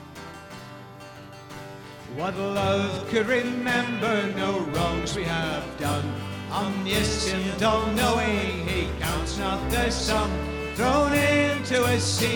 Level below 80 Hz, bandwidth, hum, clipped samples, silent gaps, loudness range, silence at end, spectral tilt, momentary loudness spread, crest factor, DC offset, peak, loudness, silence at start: -40 dBFS; 19.5 kHz; none; under 0.1%; none; 3 LU; 0 s; -4.5 dB/octave; 18 LU; 16 dB; under 0.1%; -10 dBFS; -25 LUFS; 0 s